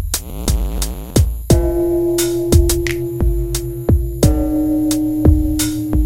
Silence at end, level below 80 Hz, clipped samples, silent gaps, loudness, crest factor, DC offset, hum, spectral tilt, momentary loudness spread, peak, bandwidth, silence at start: 0 s; -20 dBFS; under 0.1%; none; -17 LUFS; 16 dB; under 0.1%; none; -6 dB/octave; 7 LU; 0 dBFS; 17 kHz; 0 s